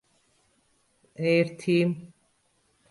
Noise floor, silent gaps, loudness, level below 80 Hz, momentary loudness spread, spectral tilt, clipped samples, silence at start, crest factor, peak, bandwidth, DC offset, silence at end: -69 dBFS; none; -26 LUFS; -72 dBFS; 7 LU; -7 dB/octave; under 0.1%; 1.2 s; 18 dB; -10 dBFS; 11.5 kHz; under 0.1%; 0.85 s